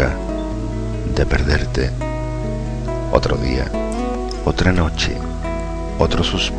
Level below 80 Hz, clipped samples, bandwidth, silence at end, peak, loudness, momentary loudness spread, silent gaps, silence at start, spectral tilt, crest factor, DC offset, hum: -24 dBFS; under 0.1%; 9.8 kHz; 0 s; 0 dBFS; -20 LUFS; 8 LU; none; 0 s; -5.5 dB/octave; 18 dB; under 0.1%; none